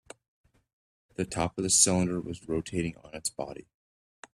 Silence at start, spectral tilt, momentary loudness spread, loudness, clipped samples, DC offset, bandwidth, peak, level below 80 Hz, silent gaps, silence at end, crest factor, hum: 1.2 s; -3.5 dB/octave; 18 LU; -28 LUFS; under 0.1%; under 0.1%; 13.5 kHz; -8 dBFS; -58 dBFS; none; 0.7 s; 24 dB; none